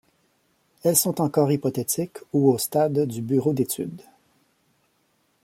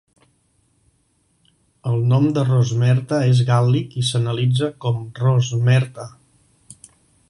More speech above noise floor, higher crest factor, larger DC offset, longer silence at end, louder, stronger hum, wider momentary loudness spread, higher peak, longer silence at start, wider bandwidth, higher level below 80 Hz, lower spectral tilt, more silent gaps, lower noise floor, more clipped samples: about the same, 45 dB vs 46 dB; about the same, 20 dB vs 16 dB; neither; first, 1.45 s vs 0.55 s; second, -23 LUFS vs -19 LUFS; neither; about the same, 7 LU vs 8 LU; about the same, -4 dBFS vs -4 dBFS; second, 0.85 s vs 1.85 s; first, 16.5 kHz vs 11 kHz; second, -66 dBFS vs -56 dBFS; about the same, -5.5 dB/octave vs -6.5 dB/octave; neither; first, -68 dBFS vs -64 dBFS; neither